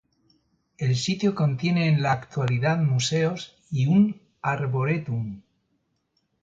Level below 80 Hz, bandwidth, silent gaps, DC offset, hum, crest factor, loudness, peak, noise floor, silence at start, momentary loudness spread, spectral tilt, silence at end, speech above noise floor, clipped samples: -60 dBFS; 9 kHz; none; under 0.1%; none; 16 dB; -24 LUFS; -10 dBFS; -73 dBFS; 0.8 s; 10 LU; -6 dB/octave; 1.05 s; 50 dB; under 0.1%